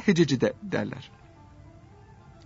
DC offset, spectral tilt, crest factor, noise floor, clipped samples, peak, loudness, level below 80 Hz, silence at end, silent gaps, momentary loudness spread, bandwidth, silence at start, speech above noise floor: under 0.1%; -6 dB/octave; 20 dB; -51 dBFS; under 0.1%; -8 dBFS; -26 LUFS; -58 dBFS; 1.4 s; none; 20 LU; 8 kHz; 0 s; 26 dB